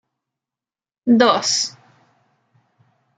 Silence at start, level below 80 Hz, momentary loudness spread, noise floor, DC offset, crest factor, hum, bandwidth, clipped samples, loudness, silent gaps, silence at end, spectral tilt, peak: 1.05 s; -70 dBFS; 12 LU; under -90 dBFS; under 0.1%; 20 dB; none; 9.4 kHz; under 0.1%; -17 LUFS; none; 1.5 s; -2.5 dB/octave; -2 dBFS